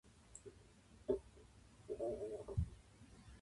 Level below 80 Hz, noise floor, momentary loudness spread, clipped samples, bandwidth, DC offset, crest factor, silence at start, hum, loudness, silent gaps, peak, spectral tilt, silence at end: -56 dBFS; -65 dBFS; 21 LU; under 0.1%; 11.5 kHz; under 0.1%; 22 dB; 0.05 s; none; -46 LUFS; none; -26 dBFS; -7.5 dB/octave; 0 s